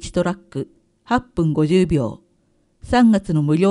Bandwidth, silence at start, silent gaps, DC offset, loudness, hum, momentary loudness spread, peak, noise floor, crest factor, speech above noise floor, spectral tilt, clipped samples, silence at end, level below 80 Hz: 11 kHz; 0 s; none; under 0.1%; -19 LUFS; none; 14 LU; -4 dBFS; -62 dBFS; 16 dB; 44 dB; -7.5 dB/octave; under 0.1%; 0 s; -40 dBFS